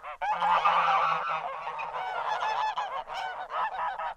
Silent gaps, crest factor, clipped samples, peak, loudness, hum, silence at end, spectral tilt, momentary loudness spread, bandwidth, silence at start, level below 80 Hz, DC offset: none; 18 dB; under 0.1%; -12 dBFS; -29 LUFS; none; 0 s; -2 dB/octave; 11 LU; 10.5 kHz; 0 s; -64 dBFS; under 0.1%